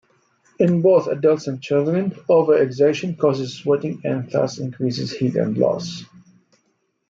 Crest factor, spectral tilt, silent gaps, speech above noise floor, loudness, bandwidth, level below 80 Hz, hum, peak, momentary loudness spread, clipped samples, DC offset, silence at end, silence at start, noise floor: 16 dB; -7 dB/octave; none; 49 dB; -20 LUFS; 7.6 kHz; -66 dBFS; none; -4 dBFS; 9 LU; under 0.1%; under 0.1%; 1.05 s; 0.6 s; -68 dBFS